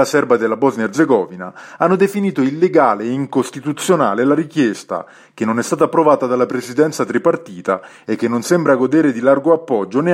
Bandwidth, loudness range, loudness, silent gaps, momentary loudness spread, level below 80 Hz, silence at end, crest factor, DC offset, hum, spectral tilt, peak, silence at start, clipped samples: 16 kHz; 1 LU; -16 LUFS; none; 9 LU; -64 dBFS; 0 s; 16 dB; under 0.1%; none; -6 dB/octave; 0 dBFS; 0 s; under 0.1%